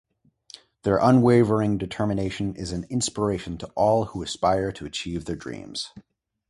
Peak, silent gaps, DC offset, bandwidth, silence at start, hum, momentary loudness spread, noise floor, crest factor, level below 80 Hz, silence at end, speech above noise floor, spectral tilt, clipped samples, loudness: -4 dBFS; none; under 0.1%; 11.5 kHz; 0.85 s; none; 15 LU; -50 dBFS; 20 dB; -48 dBFS; 0.5 s; 27 dB; -6 dB/octave; under 0.1%; -24 LUFS